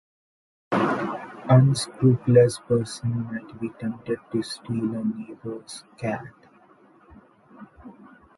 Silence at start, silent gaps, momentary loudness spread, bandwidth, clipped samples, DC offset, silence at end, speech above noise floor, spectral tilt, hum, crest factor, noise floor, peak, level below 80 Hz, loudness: 0.7 s; none; 17 LU; 11.5 kHz; under 0.1%; under 0.1%; 0.45 s; 32 dB; -7 dB/octave; none; 20 dB; -55 dBFS; -4 dBFS; -60 dBFS; -24 LUFS